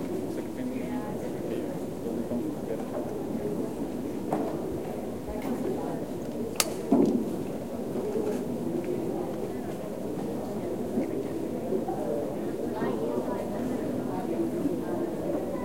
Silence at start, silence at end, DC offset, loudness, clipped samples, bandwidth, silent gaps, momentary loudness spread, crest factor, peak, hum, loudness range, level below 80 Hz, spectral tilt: 0 s; 0 s; 0.5%; -31 LUFS; under 0.1%; 16.5 kHz; none; 5 LU; 26 dB; -4 dBFS; none; 4 LU; -56 dBFS; -6 dB/octave